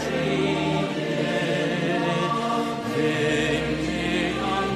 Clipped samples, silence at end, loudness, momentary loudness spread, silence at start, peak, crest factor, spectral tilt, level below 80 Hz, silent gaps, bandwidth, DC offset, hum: under 0.1%; 0 s; -24 LUFS; 3 LU; 0 s; -12 dBFS; 12 dB; -5.5 dB/octave; -46 dBFS; none; 14.5 kHz; under 0.1%; none